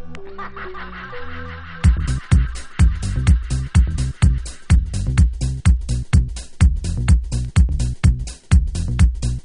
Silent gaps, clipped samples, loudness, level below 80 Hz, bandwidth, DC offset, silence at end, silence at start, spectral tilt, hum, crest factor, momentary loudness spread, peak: none; under 0.1%; -19 LUFS; -20 dBFS; 11 kHz; under 0.1%; 0.05 s; 0 s; -6 dB/octave; none; 16 dB; 14 LU; -2 dBFS